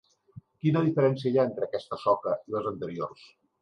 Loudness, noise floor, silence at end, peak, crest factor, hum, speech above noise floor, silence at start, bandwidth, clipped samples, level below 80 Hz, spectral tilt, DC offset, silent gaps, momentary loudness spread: -28 LUFS; -52 dBFS; 0.5 s; -10 dBFS; 18 dB; none; 25 dB; 0.35 s; 10 kHz; under 0.1%; -68 dBFS; -9 dB/octave; under 0.1%; none; 10 LU